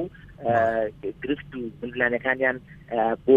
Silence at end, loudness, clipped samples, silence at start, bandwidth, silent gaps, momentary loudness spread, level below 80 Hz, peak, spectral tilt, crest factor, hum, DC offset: 0 s; -26 LUFS; under 0.1%; 0 s; 7 kHz; none; 12 LU; -54 dBFS; -6 dBFS; -8 dB/octave; 18 dB; none; under 0.1%